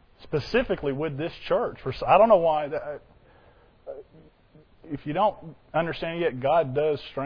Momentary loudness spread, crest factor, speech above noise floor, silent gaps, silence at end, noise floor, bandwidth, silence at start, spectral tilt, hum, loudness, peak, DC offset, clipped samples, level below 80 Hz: 21 LU; 20 dB; 32 dB; none; 0 s; -56 dBFS; 5.4 kHz; 0.2 s; -7.5 dB/octave; none; -25 LUFS; -6 dBFS; under 0.1%; under 0.1%; -52 dBFS